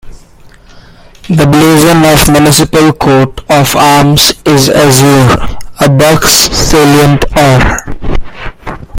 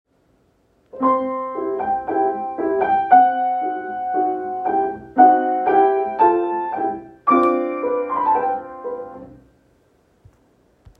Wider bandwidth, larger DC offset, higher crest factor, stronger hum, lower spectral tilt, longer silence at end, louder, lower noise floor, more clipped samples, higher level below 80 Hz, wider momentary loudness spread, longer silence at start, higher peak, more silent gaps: first, over 20 kHz vs 4 kHz; neither; second, 6 dB vs 18 dB; neither; second, -4.5 dB/octave vs -8 dB/octave; second, 0 s vs 1.65 s; first, -5 LUFS vs -19 LUFS; second, -35 dBFS vs -60 dBFS; first, 1% vs under 0.1%; first, -22 dBFS vs -60 dBFS; about the same, 14 LU vs 12 LU; second, 0.05 s vs 0.95 s; about the same, 0 dBFS vs -2 dBFS; neither